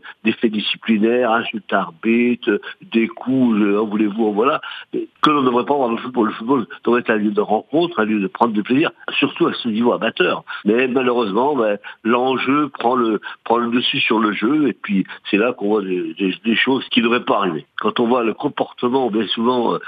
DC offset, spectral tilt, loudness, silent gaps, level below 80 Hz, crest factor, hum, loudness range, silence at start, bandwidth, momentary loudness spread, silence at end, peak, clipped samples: under 0.1%; -7.5 dB/octave; -18 LUFS; none; -68 dBFS; 18 dB; none; 1 LU; 0.05 s; 6.2 kHz; 5 LU; 0 s; 0 dBFS; under 0.1%